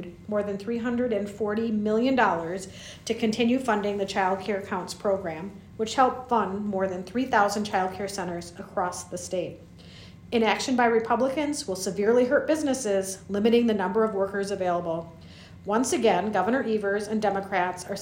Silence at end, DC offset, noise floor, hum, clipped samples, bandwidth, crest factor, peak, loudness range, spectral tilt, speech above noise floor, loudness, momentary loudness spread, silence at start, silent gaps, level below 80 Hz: 0 s; under 0.1%; -46 dBFS; none; under 0.1%; 16 kHz; 18 dB; -8 dBFS; 4 LU; -4.5 dB/octave; 21 dB; -26 LUFS; 11 LU; 0 s; none; -60 dBFS